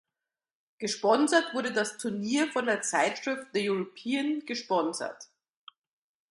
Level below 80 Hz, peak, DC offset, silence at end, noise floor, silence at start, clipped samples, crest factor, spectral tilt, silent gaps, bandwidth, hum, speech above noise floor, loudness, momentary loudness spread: -80 dBFS; -10 dBFS; under 0.1%; 1.05 s; under -90 dBFS; 0.8 s; under 0.1%; 20 dB; -3 dB/octave; none; 11.5 kHz; none; over 61 dB; -29 LUFS; 9 LU